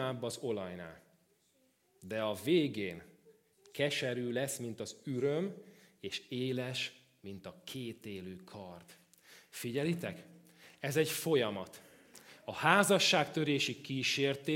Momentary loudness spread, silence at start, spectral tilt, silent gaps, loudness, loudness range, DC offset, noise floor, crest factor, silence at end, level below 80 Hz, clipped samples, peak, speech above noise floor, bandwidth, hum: 21 LU; 0 s; -4 dB/octave; none; -34 LUFS; 11 LU; under 0.1%; -73 dBFS; 26 dB; 0 s; -80 dBFS; under 0.1%; -10 dBFS; 38 dB; 16.5 kHz; none